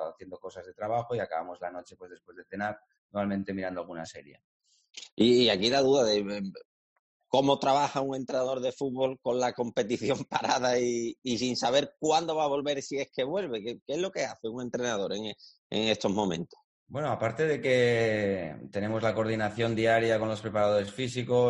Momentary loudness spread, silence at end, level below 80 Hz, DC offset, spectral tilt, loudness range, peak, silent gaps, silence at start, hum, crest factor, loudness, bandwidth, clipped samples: 16 LU; 0 s; -66 dBFS; under 0.1%; -4.5 dB/octave; 8 LU; -10 dBFS; 2.98-3.09 s, 4.44-4.60 s, 5.12-5.17 s, 6.65-7.20 s, 11.18-11.22 s, 13.82-13.86 s, 15.58-15.70 s, 16.64-16.86 s; 0 s; none; 20 dB; -29 LUFS; 11 kHz; under 0.1%